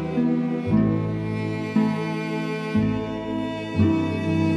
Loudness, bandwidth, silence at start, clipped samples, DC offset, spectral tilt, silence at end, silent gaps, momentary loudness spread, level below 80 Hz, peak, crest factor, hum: -24 LUFS; 10.5 kHz; 0 s; under 0.1%; under 0.1%; -8 dB/octave; 0 s; none; 7 LU; -48 dBFS; -8 dBFS; 16 dB; none